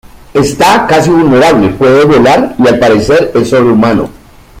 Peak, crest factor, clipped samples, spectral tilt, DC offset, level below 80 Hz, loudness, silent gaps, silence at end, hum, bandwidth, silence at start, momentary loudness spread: 0 dBFS; 6 dB; 0.1%; -5.5 dB/octave; under 0.1%; -34 dBFS; -7 LUFS; none; 0 s; none; 16 kHz; 0.35 s; 6 LU